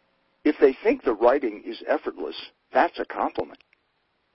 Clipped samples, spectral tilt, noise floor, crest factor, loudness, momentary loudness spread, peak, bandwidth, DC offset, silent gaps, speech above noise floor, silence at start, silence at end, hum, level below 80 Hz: under 0.1%; -8.5 dB/octave; -71 dBFS; 20 dB; -24 LUFS; 14 LU; -6 dBFS; 5.8 kHz; under 0.1%; none; 47 dB; 0.45 s; 0.85 s; none; -58 dBFS